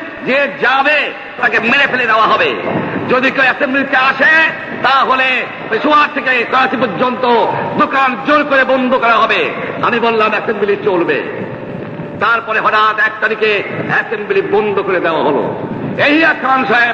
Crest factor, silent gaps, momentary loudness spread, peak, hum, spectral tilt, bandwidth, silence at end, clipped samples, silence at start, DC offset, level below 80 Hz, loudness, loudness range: 12 dB; none; 7 LU; 0 dBFS; none; -5.5 dB/octave; 8.2 kHz; 0 s; under 0.1%; 0 s; under 0.1%; -52 dBFS; -12 LUFS; 3 LU